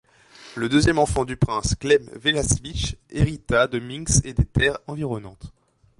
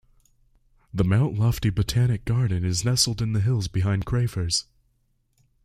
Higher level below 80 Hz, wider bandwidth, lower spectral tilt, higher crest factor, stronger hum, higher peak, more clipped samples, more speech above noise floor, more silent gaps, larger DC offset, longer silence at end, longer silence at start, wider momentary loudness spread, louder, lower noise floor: first, -34 dBFS vs -42 dBFS; second, 11.5 kHz vs 15.5 kHz; about the same, -4.5 dB/octave vs -5 dB/octave; about the same, 18 dB vs 18 dB; neither; about the same, -6 dBFS vs -6 dBFS; neither; second, 26 dB vs 45 dB; neither; neither; second, 0.5 s vs 1 s; second, 0.4 s vs 0.95 s; first, 10 LU vs 4 LU; about the same, -22 LUFS vs -24 LUFS; second, -48 dBFS vs -68 dBFS